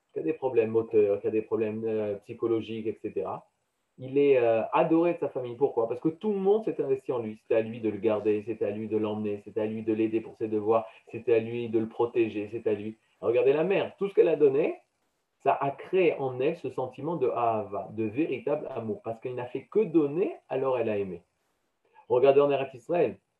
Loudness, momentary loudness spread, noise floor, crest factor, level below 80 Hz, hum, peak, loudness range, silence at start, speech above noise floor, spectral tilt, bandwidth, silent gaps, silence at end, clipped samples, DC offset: -28 LUFS; 11 LU; -77 dBFS; 18 dB; -76 dBFS; none; -10 dBFS; 4 LU; 0.15 s; 50 dB; -9 dB/octave; 4.4 kHz; none; 0.25 s; under 0.1%; under 0.1%